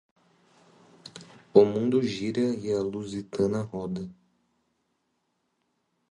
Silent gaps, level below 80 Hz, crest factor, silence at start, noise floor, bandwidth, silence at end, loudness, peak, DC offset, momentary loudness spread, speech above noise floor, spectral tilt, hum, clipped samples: none; -64 dBFS; 26 dB; 1.05 s; -76 dBFS; 10.5 kHz; 2 s; -27 LUFS; -4 dBFS; under 0.1%; 24 LU; 50 dB; -7 dB/octave; none; under 0.1%